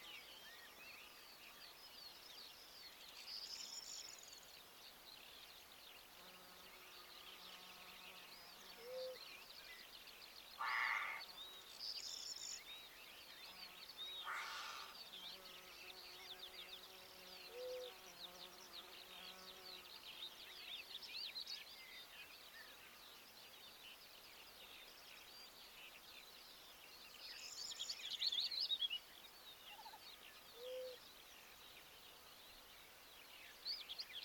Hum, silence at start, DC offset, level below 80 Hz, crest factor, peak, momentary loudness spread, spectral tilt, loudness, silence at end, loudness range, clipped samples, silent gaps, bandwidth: none; 0 s; under 0.1%; -82 dBFS; 24 dB; -30 dBFS; 12 LU; 0.5 dB/octave; -51 LUFS; 0 s; 13 LU; under 0.1%; none; 19 kHz